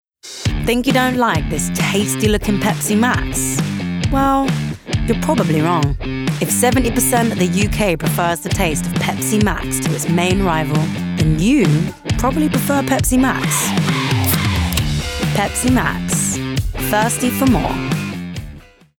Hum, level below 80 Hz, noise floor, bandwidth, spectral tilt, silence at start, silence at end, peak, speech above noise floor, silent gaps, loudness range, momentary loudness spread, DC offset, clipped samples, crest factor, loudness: none; -30 dBFS; -38 dBFS; over 20 kHz; -4.5 dB/octave; 0.25 s; 0.4 s; -2 dBFS; 22 dB; none; 1 LU; 6 LU; under 0.1%; under 0.1%; 14 dB; -17 LUFS